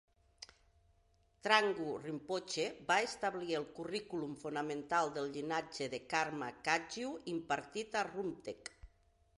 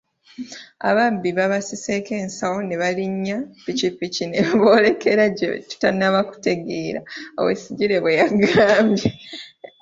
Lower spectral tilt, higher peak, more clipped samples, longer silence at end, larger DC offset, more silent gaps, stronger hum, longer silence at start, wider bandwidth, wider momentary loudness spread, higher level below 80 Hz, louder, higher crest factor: second, -3.5 dB/octave vs -5 dB/octave; second, -14 dBFS vs -2 dBFS; neither; first, 0.5 s vs 0.35 s; neither; neither; neither; about the same, 0.4 s vs 0.4 s; first, 11.5 kHz vs 7.8 kHz; second, 11 LU vs 15 LU; second, -72 dBFS vs -56 dBFS; second, -38 LUFS vs -20 LUFS; first, 26 dB vs 18 dB